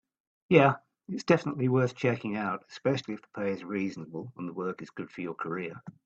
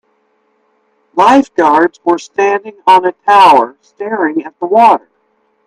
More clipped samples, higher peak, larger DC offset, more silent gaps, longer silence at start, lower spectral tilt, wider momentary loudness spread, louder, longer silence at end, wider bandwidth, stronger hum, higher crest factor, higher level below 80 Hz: second, under 0.1% vs 0.2%; second, -6 dBFS vs 0 dBFS; neither; neither; second, 0.5 s vs 1.15 s; first, -7 dB/octave vs -4.5 dB/octave; first, 16 LU vs 12 LU; second, -30 LUFS vs -10 LUFS; second, 0.15 s vs 0.7 s; second, 8 kHz vs 12.5 kHz; neither; first, 24 dB vs 12 dB; second, -70 dBFS vs -60 dBFS